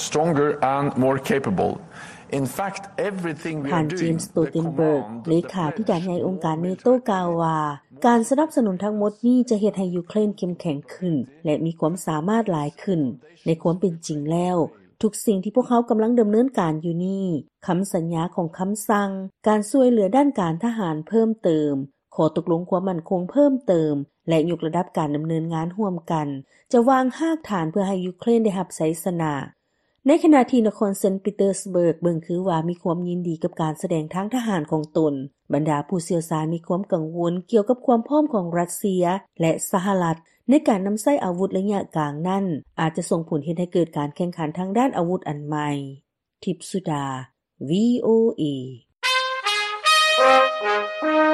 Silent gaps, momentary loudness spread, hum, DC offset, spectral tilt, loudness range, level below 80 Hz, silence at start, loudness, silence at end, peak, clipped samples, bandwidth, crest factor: none; 9 LU; none; under 0.1%; -6 dB/octave; 4 LU; -62 dBFS; 0 s; -22 LUFS; 0 s; -4 dBFS; under 0.1%; 13 kHz; 18 dB